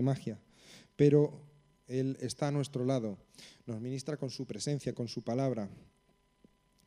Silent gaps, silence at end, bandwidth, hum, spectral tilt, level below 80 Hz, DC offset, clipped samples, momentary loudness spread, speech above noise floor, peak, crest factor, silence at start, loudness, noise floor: none; 1.1 s; 12 kHz; none; -7 dB/octave; -70 dBFS; under 0.1%; under 0.1%; 20 LU; 34 dB; -14 dBFS; 20 dB; 0 s; -34 LUFS; -68 dBFS